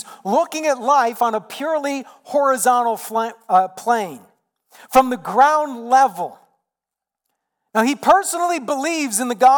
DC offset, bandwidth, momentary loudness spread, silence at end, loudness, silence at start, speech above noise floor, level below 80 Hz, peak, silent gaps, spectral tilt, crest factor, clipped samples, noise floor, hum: under 0.1%; 19 kHz; 8 LU; 0 s; -18 LUFS; 0.05 s; 68 dB; -60 dBFS; -4 dBFS; none; -3 dB/octave; 16 dB; under 0.1%; -86 dBFS; none